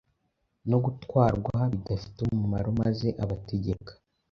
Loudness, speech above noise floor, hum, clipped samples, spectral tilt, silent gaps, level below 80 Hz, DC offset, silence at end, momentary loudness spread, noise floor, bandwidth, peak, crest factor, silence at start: -29 LUFS; 49 dB; none; under 0.1%; -9.5 dB/octave; none; -46 dBFS; under 0.1%; 0.4 s; 9 LU; -76 dBFS; 6.6 kHz; -8 dBFS; 22 dB; 0.65 s